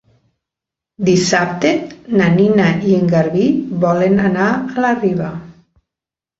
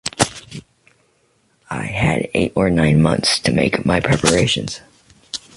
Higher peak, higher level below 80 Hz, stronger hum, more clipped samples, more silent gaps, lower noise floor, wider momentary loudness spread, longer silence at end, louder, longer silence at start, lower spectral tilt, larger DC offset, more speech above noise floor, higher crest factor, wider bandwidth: about the same, -2 dBFS vs 0 dBFS; second, -50 dBFS vs -38 dBFS; neither; neither; neither; first, -87 dBFS vs -61 dBFS; second, 7 LU vs 16 LU; first, 0.9 s vs 0.2 s; about the same, -15 LUFS vs -17 LUFS; first, 1 s vs 0.05 s; first, -6 dB/octave vs -4.5 dB/octave; neither; first, 74 dB vs 44 dB; about the same, 14 dB vs 18 dB; second, 8 kHz vs 11.5 kHz